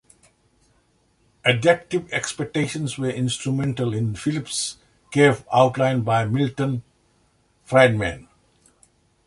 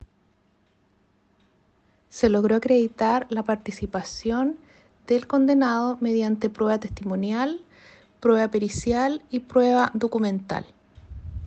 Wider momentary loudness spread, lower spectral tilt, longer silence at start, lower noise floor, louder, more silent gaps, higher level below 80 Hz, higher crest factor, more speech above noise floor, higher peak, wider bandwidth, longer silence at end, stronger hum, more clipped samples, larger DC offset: about the same, 9 LU vs 11 LU; about the same, -5 dB/octave vs -6 dB/octave; second, 1.45 s vs 2.15 s; about the same, -63 dBFS vs -65 dBFS; about the same, -21 LUFS vs -23 LUFS; neither; about the same, -52 dBFS vs -50 dBFS; about the same, 22 dB vs 18 dB; about the same, 42 dB vs 42 dB; first, -2 dBFS vs -6 dBFS; first, 11.5 kHz vs 8.6 kHz; first, 1.05 s vs 0 s; neither; neither; neither